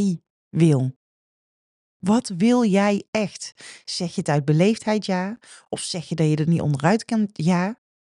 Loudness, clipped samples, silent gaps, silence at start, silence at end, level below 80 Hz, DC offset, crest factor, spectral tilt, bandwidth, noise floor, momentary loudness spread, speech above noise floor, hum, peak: -22 LUFS; under 0.1%; 0.30-0.51 s, 0.96-2.00 s, 3.08-3.13 s; 0 s; 0.25 s; -62 dBFS; under 0.1%; 18 dB; -6.5 dB/octave; 11 kHz; under -90 dBFS; 12 LU; over 69 dB; none; -4 dBFS